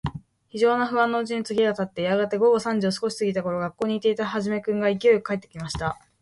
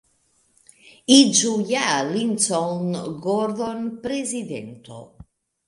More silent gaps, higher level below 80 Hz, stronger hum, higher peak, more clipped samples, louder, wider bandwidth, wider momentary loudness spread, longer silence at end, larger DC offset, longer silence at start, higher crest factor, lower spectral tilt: neither; first, -52 dBFS vs -62 dBFS; neither; second, -8 dBFS vs 0 dBFS; neither; second, -24 LUFS vs -20 LUFS; about the same, 11.5 kHz vs 11.5 kHz; second, 10 LU vs 20 LU; second, 0.25 s vs 0.65 s; neither; second, 0.05 s vs 1.1 s; second, 16 dB vs 22 dB; first, -5.5 dB/octave vs -3 dB/octave